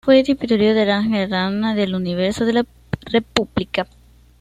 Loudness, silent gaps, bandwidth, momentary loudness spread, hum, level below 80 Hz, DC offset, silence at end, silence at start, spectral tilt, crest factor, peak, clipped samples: -19 LUFS; none; 11.5 kHz; 9 LU; none; -46 dBFS; under 0.1%; 0.55 s; 0.05 s; -6 dB/octave; 18 dB; 0 dBFS; under 0.1%